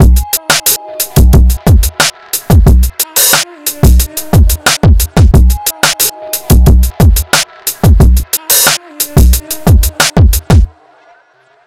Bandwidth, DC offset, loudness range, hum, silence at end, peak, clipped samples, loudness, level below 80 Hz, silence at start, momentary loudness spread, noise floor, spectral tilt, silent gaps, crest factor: 17 kHz; under 0.1%; 1 LU; none; 1 s; 0 dBFS; 1%; -9 LUFS; -10 dBFS; 0 s; 5 LU; -47 dBFS; -4 dB/octave; none; 8 dB